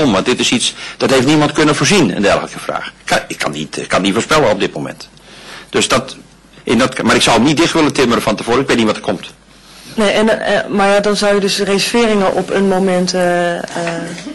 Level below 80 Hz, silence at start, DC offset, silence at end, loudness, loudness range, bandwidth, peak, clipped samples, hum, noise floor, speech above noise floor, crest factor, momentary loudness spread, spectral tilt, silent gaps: -42 dBFS; 0 s; under 0.1%; 0 s; -13 LUFS; 3 LU; 13 kHz; -4 dBFS; under 0.1%; none; -39 dBFS; 26 dB; 10 dB; 11 LU; -4 dB/octave; none